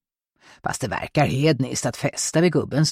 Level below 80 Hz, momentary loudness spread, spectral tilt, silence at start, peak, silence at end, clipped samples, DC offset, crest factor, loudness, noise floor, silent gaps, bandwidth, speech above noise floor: -52 dBFS; 8 LU; -5 dB/octave; 0.65 s; -6 dBFS; 0 s; under 0.1%; under 0.1%; 16 dB; -22 LUFS; -58 dBFS; none; 15.5 kHz; 36 dB